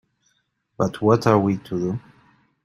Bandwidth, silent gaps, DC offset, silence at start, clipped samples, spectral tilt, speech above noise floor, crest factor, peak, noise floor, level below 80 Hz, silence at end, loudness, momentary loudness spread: 15.5 kHz; none; under 0.1%; 0.8 s; under 0.1%; -7.5 dB/octave; 50 dB; 22 dB; -2 dBFS; -70 dBFS; -58 dBFS; 0.65 s; -21 LUFS; 10 LU